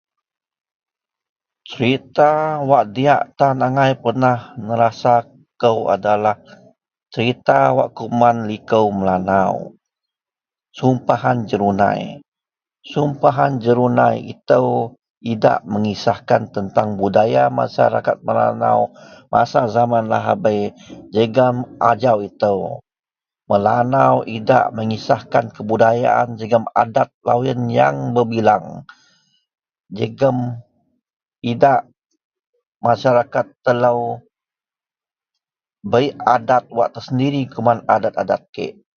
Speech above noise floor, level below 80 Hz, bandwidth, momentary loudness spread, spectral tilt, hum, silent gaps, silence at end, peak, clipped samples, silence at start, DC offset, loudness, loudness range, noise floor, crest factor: over 74 dB; -54 dBFS; 6.8 kHz; 9 LU; -7.5 dB/octave; none; 12.28-12.32 s, 15.10-15.21 s, 27.14-27.21 s, 31.13-31.20 s, 32.24-32.30 s, 32.47-32.53 s, 32.67-32.80 s, 38.49-38.53 s; 0.25 s; 0 dBFS; under 0.1%; 1.7 s; under 0.1%; -17 LUFS; 4 LU; under -90 dBFS; 18 dB